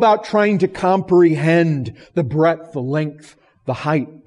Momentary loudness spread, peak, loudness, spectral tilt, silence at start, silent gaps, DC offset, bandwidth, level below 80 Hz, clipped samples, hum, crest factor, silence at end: 11 LU; -4 dBFS; -17 LUFS; -8 dB/octave; 0 s; none; under 0.1%; 11 kHz; -54 dBFS; under 0.1%; none; 12 dB; 0.1 s